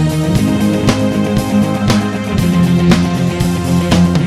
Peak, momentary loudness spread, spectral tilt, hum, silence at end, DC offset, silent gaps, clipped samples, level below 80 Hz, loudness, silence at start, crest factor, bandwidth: 0 dBFS; 4 LU; -6.5 dB/octave; none; 0 s; under 0.1%; none; under 0.1%; -30 dBFS; -13 LUFS; 0 s; 12 dB; 14.5 kHz